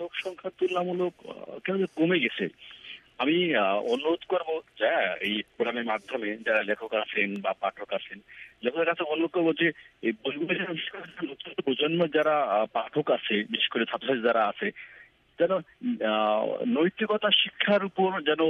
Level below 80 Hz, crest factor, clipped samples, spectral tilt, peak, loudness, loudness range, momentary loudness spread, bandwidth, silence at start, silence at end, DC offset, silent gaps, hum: -74 dBFS; 18 dB; under 0.1%; -6.5 dB/octave; -10 dBFS; -27 LUFS; 3 LU; 10 LU; 9.6 kHz; 0 s; 0 s; under 0.1%; none; none